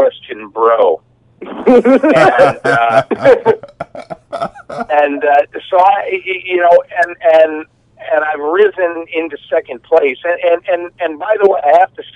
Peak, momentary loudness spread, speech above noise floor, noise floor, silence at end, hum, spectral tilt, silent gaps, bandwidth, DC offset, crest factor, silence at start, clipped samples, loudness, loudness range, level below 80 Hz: 0 dBFS; 14 LU; 21 dB; -32 dBFS; 0.15 s; none; -6 dB/octave; none; 11 kHz; under 0.1%; 12 dB; 0 s; 0.6%; -12 LUFS; 4 LU; -54 dBFS